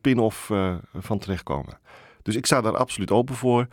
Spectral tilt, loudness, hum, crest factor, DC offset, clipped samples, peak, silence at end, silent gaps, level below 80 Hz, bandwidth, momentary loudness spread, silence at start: -5.5 dB/octave; -24 LUFS; none; 20 dB; under 0.1%; under 0.1%; -4 dBFS; 0.05 s; none; -50 dBFS; 18.5 kHz; 10 LU; 0.05 s